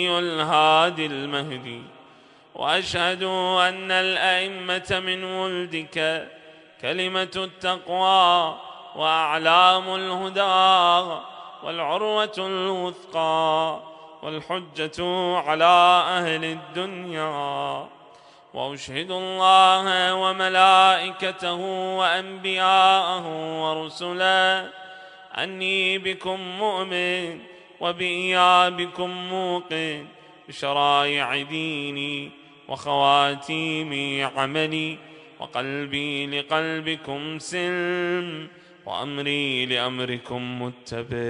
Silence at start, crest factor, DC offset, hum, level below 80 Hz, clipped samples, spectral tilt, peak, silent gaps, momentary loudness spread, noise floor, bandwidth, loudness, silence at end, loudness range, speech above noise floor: 0 s; 22 dB; under 0.1%; none; -64 dBFS; under 0.1%; -3.5 dB/octave; -2 dBFS; none; 16 LU; -52 dBFS; 10.5 kHz; -22 LUFS; 0 s; 7 LU; 29 dB